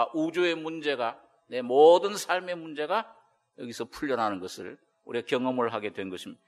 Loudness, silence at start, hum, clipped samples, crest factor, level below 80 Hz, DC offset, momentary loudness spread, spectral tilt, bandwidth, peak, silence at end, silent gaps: -27 LUFS; 0 s; none; under 0.1%; 20 dB; -72 dBFS; under 0.1%; 19 LU; -4 dB/octave; 13 kHz; -8 dBFS; 0.15 s; none